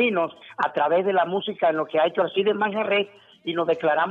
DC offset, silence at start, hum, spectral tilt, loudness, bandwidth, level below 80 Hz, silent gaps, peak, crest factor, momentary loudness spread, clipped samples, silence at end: under 0.1%; 0 s; none; -7 dB/octave; -23 LUFS; 6.6 kHz; -76 dBFS; none; -8 dBFS; 14 dB; 7 LU; under 0.1%; 0 s